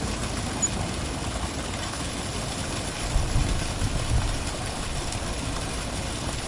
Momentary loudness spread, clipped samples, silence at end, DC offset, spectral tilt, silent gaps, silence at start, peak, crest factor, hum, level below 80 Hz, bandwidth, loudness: 4 LU; under 0.1%; 0 s; under 0.1%; -3.5 dB/octave; none; 0 s; -12 dBFS; 16 dB; none; -32 dBFS; 11.5 kHz; -29 LUFS